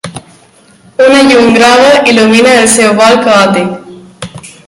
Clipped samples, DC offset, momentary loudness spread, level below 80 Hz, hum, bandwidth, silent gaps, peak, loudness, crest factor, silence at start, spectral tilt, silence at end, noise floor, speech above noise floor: 3%; under 0.1%; 21 LU; -44 dBFS; none; 16 kHz; none; 0 dBFS; -5 LUFS; 6 dB; 0.05 s; -3.5 dB/octave; 0.2 s; -41 dBFS; 36 dB